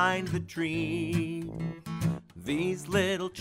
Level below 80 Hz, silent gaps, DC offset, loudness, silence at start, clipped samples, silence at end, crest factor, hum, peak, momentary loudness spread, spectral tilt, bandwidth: -56 dBFS; none; under 0.1%; -31 LUFS; 0 s; under 0.1%; 0 s; 20 dB; none; -12 dBFS; 9 LU; -5.5 dB/octave; 16 kHz